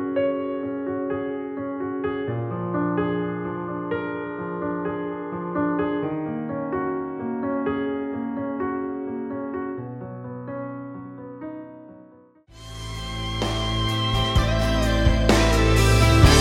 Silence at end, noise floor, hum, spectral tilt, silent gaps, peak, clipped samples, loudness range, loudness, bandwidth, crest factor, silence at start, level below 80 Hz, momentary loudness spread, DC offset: 0 s; -51 dBFS; none; -5.5 dB/octave; none; -2 dBFS; under 0.1%; 12 LU; -25 LUFS; 16.5 kHz; 20 dB; 0 s; -30 dBFS; 17 LU; under 0.1%